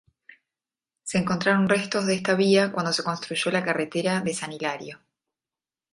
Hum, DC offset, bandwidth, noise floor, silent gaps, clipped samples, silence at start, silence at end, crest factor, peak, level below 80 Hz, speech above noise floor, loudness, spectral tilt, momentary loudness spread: none; under 0.1%; 11.5 kHz; under -90 dBFS; none; under 0.1%; 1.05 s; 0.95 s; 18 dB; -8 dBFS; -64 dBFS; over 66 dB; -24 LUFS; -4.5 dB/octave; 10 LU